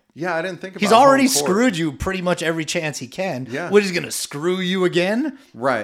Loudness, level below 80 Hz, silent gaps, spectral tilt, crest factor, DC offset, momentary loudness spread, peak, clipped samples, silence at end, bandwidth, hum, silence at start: -19 LUFS; -48 dBFS; none; -4 dB/octave; 18 dB; under 0.1%; 13 LU; 0 dBFS; under 0.1%; 0 s; 16.5 kHz; none; 0.15 s